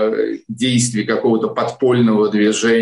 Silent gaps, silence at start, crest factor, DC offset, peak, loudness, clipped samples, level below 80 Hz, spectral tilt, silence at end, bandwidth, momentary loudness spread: none; 0 s; 10 dB; under 0.1%; -4 dBFS; -16 LUFS; under 0.1%; -58 dBFS; -5 dB/octave; 0 s; 11.5 kHz; 7 LU